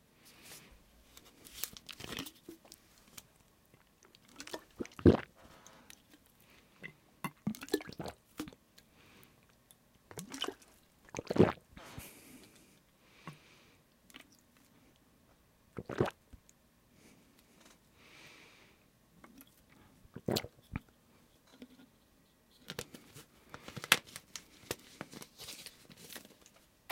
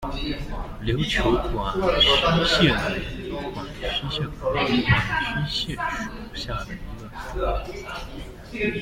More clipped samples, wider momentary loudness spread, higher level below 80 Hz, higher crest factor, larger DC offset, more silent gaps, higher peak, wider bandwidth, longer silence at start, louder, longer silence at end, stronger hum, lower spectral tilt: neither; first, 30 LU vs 16 LU; second, -62 dBFS vs -34 dBFS; first, 38 dB vs 20 dB; neither; neither; about the same, -2 dBFS vs -4 dBFS; about the same, 16.5 kHz vs 16.5 kHz; first, 0.45 s vs 0 s; second, -38 LUFS vs -24 LUFS; first, 0.7 s vs 0 s; neither; about the same, -4.5 dB/octave vs -5 dB/octave